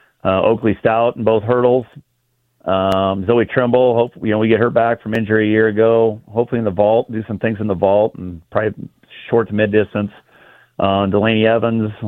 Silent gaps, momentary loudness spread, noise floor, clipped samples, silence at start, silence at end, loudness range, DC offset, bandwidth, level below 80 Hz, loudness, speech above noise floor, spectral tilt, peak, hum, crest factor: none; 8 LU; -65 dBFS; under 0.1%; 0.25 s; 0 s; 4 LU; under 0.1%; 6 kHz; -52 dBFS; -16 LUFS; 50 dB; -8.5 dB/octave; 0 dBFS; none; 16 dB